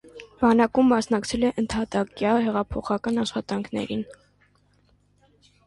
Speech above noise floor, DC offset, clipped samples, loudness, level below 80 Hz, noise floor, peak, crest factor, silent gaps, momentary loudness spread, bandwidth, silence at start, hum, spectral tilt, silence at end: 39 dB; under 0.1%; under 0.1%; -24 LUFS; -50 dBFS; -62 dBFS; -8 dBFS; 18 dB; none; 10 LU; 11.5 kHz; 0.05 s; 50 Hz at -45 dBFS; -5.5 dB/octave; 1.5 s